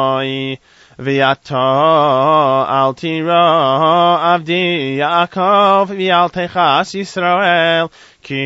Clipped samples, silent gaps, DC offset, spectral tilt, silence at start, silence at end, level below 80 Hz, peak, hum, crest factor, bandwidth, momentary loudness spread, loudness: under 0.1%; none; under 0.1%; -5.5 dB/octave; 0 s; 0 s; -60 dBFS; 0 dBFS; none; 14 dB; 8 kHz; 8 LU; -13 LUFS